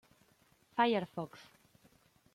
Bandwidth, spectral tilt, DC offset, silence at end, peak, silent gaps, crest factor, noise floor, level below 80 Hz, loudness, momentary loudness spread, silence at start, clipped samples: 15.5 kHz; -6 dB/octave; under 0.1%; 0.9 s; -16 dBFS; none; 22 dB; -70 dBFS; -80 dBFS; -35 LUFS; 17 LU; 0.75 s; under 0.1%